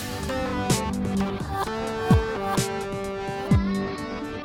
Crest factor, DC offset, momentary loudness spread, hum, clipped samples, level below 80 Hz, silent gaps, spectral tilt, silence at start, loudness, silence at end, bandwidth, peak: 20 dB; under 0.1%; 8 LU; none; under 0.1%; -36 dBFS; none; -5.5 dB/octave; 0 s; -26 LUFS; 0 s; 17.5 kHz; -6 dBFS